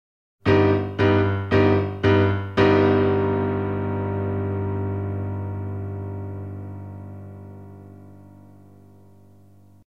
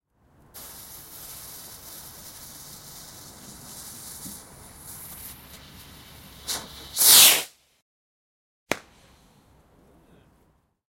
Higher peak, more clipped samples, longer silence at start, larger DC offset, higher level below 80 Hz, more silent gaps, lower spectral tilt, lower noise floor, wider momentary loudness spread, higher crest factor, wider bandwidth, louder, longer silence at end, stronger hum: about the same, -4 dBFS vs -2 dBFS; neither; about the same, 0.45 s vs 0.55 s; neither; first, -50 dBFS vs -58 dBFS; second, none vs 7.82-8.66 s; first, -8.5 dB/octave vs 1 dB/octave; second, -52 dBFS vs -65 dBFS; second, 19 LU vs 28 LU; second, 18 dB vs 26 dB; second, 6.2 kHz vs 16.5 kHz; second, -22 LUFS vs -17 LUFS; second, 1.55 s vs 2.15 s; neither